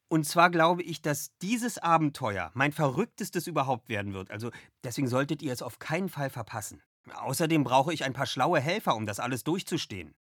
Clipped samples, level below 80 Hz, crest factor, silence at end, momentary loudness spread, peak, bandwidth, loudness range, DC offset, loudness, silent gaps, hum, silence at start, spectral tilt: under 0.1%; -68 dBFS; 22 dB; 0.15 s; 13 LU; -8 dBFS; 19 kHz; 6 LU; under 0.1%; -29 LUFS; 6.86-7.04 s; none; 0.1 s; -5 dB/octave